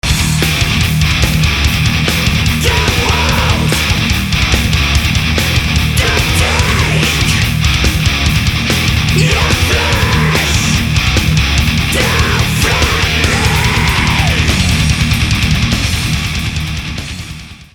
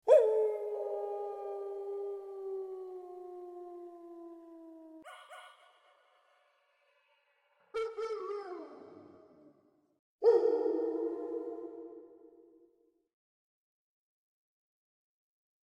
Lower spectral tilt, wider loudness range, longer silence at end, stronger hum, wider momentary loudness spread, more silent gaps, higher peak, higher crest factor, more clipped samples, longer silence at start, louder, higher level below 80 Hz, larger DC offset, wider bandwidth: about the same, -4 dB/octave vs -4.5 dB/octave; second, 1 LU vs 19 LU; second, 0.1 s vs 3.45 s; neither; second, 2 LU vs 24 LU; second, none vs 9.99-10.19 s; first, 0 dBFS vs -12 dBFS; second, 12 dB vs 24 dB; neither; about the same, 0.05 s vs 0.05 s; first, -12 LUFS vs -34 LUFS; first, -18 dBFS vs -86 dBFS; neither; first, over 20 kHz vs 10.5 kHz